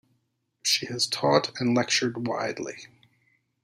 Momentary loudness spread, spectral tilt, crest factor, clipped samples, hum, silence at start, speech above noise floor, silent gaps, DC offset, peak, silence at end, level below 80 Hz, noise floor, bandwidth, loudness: 11 LU; -3 dB/octave; 22 dB; under 0.1%; none; 0.65 s; 48 dB; none; under 0.1%; -6 dBFS; 0.75 s; -72 dBFS; -75 dBFS; 15.5 kHz; -25 LUFS